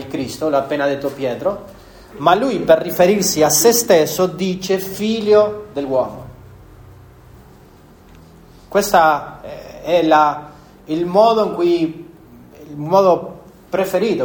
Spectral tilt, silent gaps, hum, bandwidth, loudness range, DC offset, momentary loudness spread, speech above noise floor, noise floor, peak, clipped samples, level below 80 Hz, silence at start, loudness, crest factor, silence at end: -4 dB/octave; none; none; over 20 kHz; 6 LU; under 0.1%; 15 LU; 29 dB; -44 dBFS; 0 dBFS; under 0.1%; -50 dBFS; 0 s; -16 LUFS; 16 dB; 0 s